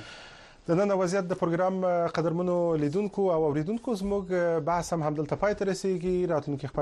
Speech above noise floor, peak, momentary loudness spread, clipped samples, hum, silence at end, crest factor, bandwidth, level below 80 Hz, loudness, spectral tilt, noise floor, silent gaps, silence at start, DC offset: 22 dB; -14 dBFS; 5 LU; under 0.1%; none; 0 s; 14 dB; 12 kHz; -54 dBFS; -28 LUFS; -7 dB/octave; -49 dBFS; none; 0 s; under 0.1%